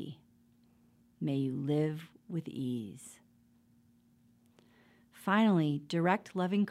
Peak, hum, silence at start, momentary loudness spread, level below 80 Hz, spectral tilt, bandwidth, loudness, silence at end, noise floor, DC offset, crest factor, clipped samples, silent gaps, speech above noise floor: -14 dBFS; none; 0 s; 18 LU; -80 dBFS; -7 dB/octave; 14 kHz; -33 LUFS; 0 s; -67 dBFS; under 0.1%; 20 dB; under 0.1%; none; 35 dB